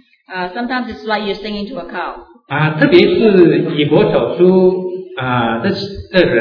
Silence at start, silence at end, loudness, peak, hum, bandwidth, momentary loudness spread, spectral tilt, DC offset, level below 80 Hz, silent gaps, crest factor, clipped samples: 0.3 s; 0 s; -14 LUFS; 0 dBFS; none; 5.4 kHz; 15 LU; -8.5 dB/octave; under 0.1%; -44 dBFS; none; 14 dB; 0.2%